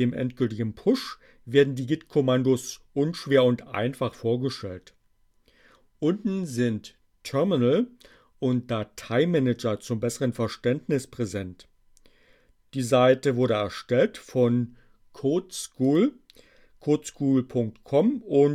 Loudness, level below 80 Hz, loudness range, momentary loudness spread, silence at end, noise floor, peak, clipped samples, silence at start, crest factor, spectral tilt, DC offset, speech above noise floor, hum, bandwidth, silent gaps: -26 LUFS; -62 dBFS; 5 LU; 10 LU; 0 s; -64 dBFS; -8 dBFS; under 0.1%; 0 s; 18 dB; -6.5 dB/octave; under 0.1%; 39 dB; none; 15 kHz; none